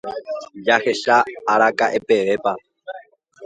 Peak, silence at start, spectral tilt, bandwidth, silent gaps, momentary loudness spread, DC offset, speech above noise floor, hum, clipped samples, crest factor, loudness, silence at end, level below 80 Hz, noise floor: 0 dBFS; 0.05 s; -3.5 dB/octave; 9.2 kHz; none; 19 LU; under 0.1%; 24 dB; none; under 0.1%; 20 dB; -18 LUFS; 0 s; -66 dBFS; -43 dBFS